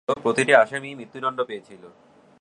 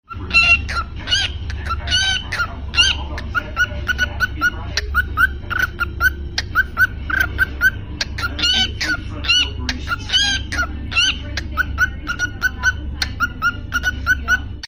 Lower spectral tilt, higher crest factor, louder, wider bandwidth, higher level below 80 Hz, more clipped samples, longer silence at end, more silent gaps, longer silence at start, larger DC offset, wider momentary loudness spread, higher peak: first, -4 dB/octave vs -2 dB/octave; first, 22 dB vs 16 dB; second, -22 LUFS vs -18 LUFS; second, 11.5 kHz vs 16 kHz; second, -70 dBFS vs -30 dBFS; neither; first, 0.55 s vs 0 s; neither; about the same, 0.1 s vs 0.1 s; neither; first, 17 LU vs 9 LU; about the same, -2 dBFS vs -2 dBFS